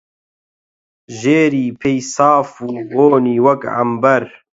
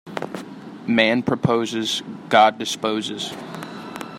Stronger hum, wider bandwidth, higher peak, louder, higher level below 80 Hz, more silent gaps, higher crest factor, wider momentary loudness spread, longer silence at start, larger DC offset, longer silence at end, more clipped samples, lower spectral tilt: neither; second, 8 kHz vs 16 kHz; about the same, 0 dBFS vs -2 dBFS; first, -14 LUFS vs -20 LUFS; about the same, -58 dBFS vs -62 dBFS; neither; about the same, 16 dB vs 20 dB; second, 9 LU vs 18 LU; first, 1.1 s vs 0.05 s; neither; first, 0.3 s vs 0 s; neither; first, -6 dB/octave vs -4.5 dB/octave